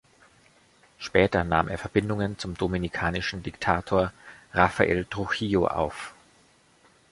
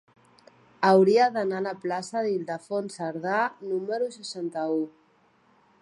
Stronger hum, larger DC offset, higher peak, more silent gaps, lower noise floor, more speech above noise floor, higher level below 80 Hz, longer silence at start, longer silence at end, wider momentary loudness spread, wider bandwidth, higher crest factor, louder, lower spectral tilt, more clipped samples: neither; neither; about the same, -4 dBFS vs -6 dBFS; neither; about the same, -60 dBFS vs -63 dBFS; about the same, 34 dB vs 37 dB; first, -46 dBFS vs -78 dBFS; first, 1 s vs 0.8 s; about the same, 1 s vs 0.9 s; second, 9 LU vs 12 LU; about the same, 11.5 kHz vs 11 kHz; about the same, 24 dB vs 20 dB; about the same, -26 LUFS vs -26 LUFS; about the same, -6 dB/octave vs -5.5 dB/octave; neither